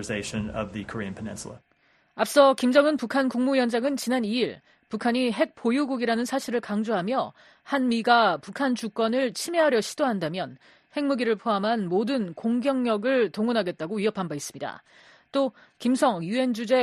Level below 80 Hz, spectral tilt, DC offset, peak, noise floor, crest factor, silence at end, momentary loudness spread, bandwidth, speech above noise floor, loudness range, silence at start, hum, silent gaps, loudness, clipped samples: -62 dBFS; -4.5 dB/octave; under 0.1%; -4 dBFS; -64 dBFS; 20 dB; 0 s; 13 LU; 13 kHz; 39 dB; 4 LU; 0 s; none; none; -25 LUFS; under 0.1%